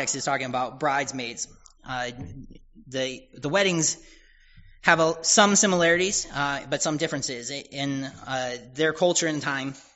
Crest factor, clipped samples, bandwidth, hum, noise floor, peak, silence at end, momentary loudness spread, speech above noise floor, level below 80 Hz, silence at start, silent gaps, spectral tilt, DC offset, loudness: 24 dB; under 0.1%; 8 kHz; none; -52 dBFS; -2 dBFS; 0.15 s; 14 LU; 27 dB; -56 dBFS; 0 s; none; -2.5 dB/octave; under 0.1%; -24 LUFS